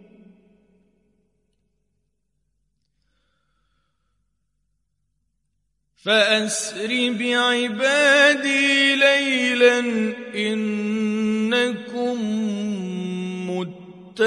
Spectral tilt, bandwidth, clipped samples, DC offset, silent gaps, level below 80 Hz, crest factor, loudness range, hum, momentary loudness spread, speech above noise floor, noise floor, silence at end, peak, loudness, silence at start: -3.5 dB/octave; 11.5 kHz; under 0.1%; under 0.1%; none; -72 dBFS; 20 dB; 8 LU; none; 13 LU; 54 dB; -74 dBFS; 0 s; -4 dBFS; -19 LUFS; 6.05 s